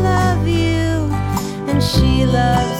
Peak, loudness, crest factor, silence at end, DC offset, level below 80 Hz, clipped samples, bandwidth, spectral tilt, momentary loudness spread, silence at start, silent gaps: -4 dBFS; -16 LUFS; 12 dB; 0 s; under 0.1%; -26 dBFS; under 0.1%; 16 kHz; -6 dB/octave; 5 LU; 0 s; none